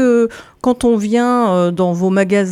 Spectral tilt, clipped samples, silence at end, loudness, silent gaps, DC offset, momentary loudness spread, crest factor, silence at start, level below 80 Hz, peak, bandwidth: -6.5 dB/octave; under 0.1%; 0 s; -15 LUFS; none; under 0.1%; 5 LU; 12 dB; 0 s; -46 dBFS; -2 dBFS; 13 kHz